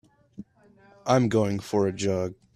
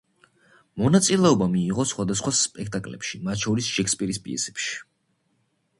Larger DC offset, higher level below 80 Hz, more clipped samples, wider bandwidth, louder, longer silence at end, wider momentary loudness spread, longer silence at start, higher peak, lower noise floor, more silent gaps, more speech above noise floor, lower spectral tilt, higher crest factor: neither; second, -60 dBFS vs -54 dBFS; neither; first, 13.5 kHz vs 11.5 kHz; about the same, -25 LUFS vs -23 LUFS; second, 0.2 s vs 0.95 s; first, 25 LU vs 13 LU; second, 0.4 s vs 0.75 s; second, -8 dBFS vs -4 dBFS; second, -57 dBFS vs -70 dBFS; neither; second, 33 dB vs 47 dB; first, -6.5 dB/octave vs -4 dB/octave; about the same, 20 dB vs 20 dB